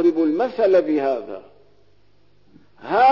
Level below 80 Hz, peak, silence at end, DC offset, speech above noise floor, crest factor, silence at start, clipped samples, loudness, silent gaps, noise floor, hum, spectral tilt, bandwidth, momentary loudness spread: -66 dBFS; -8 dBFS; 0 s; 0.3%; 42 dB; 14 dB; 0 s; under 0.1%; -19 LUFS; none; -60 dBFS; 50 Hz at -60 dBFS; -7 dB/octave; 6 kHz; 20 LU